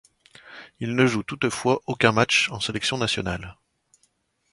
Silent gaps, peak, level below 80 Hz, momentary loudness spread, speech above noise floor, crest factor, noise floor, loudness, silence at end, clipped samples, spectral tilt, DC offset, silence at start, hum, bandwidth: none; -2 dBFS; -52 dBFS; 21 LU; 45 dB; 22 dB; -68 dBFS; -23 LUFS; 1 s; under 0.1%; -4 dB/octave; under 0.1%; 0.45 s; none; 11.5 kHz